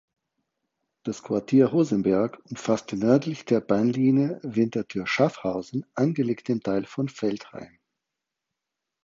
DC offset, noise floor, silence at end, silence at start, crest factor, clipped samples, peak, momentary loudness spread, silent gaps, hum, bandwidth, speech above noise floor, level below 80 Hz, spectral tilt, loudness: under 0.1%; -85 dBFS; 1.4 s; 1.05 s; 20 dB; under 0.1%; -6 dBFS; 11 LU; none; none; 7.6 kHz; 61 dB; -64 dBFS; -7 dB/octave; -25 LUFS